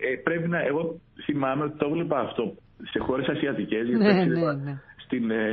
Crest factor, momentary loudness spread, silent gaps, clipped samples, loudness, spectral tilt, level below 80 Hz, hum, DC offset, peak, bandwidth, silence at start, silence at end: 20 dB; 12 LU; none; under 0.1%; -26 LUFS; -10 dB/octave; -58 dBFS; none; under 0.1%; -6 dBFS; 5 kHz; 0 s; 0 s